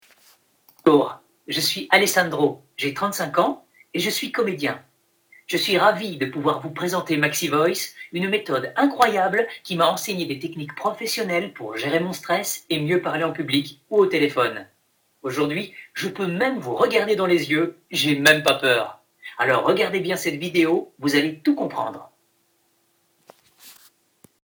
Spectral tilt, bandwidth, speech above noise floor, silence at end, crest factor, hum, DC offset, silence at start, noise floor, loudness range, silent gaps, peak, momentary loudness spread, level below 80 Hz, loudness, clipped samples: -4 dB/octave; 19.5 kHz; 44 dB; 0.75 s; 22 dB; none; under 0.1%; 0.85 s; -66 dBFS; 5 LU; none; 0 dBFS; 11 LU; -68 dBFS; -22 LUFS; under 0.1%